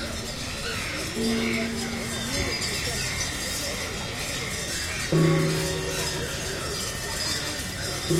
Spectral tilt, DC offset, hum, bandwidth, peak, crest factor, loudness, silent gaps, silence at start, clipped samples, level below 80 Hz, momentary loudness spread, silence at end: -3.5 dB/octave; under 0.1%; none; 16.5 kHz; -10 dBFS; 18 dB; -27 LUFS; none; 0 s; under 0.1%; -42 dBFS; 6 LU; 0 s